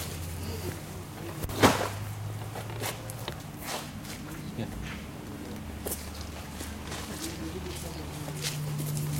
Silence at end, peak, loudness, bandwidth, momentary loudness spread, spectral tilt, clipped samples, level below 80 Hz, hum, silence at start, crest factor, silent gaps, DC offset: 0 s; -6 dBFS; -34 LUFS; 16.5 kHz; 8 LU; -4.5 dB/octave; under 0.1%; -48 dBFS; none; 0 s; 28 dB; none; under 0.1%